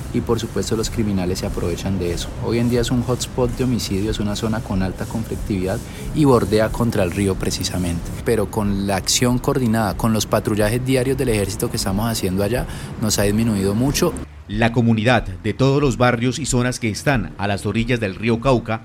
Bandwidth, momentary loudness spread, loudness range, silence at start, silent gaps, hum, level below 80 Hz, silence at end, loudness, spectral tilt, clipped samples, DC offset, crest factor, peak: 17 kHz; 7 LU; 3 LU; 0 s; none; none; -34 dBFS; 0 s; -20 LUFS; -5 dB/octave; under 0.1%; under 0.1%; 16 dB; -2 dBFS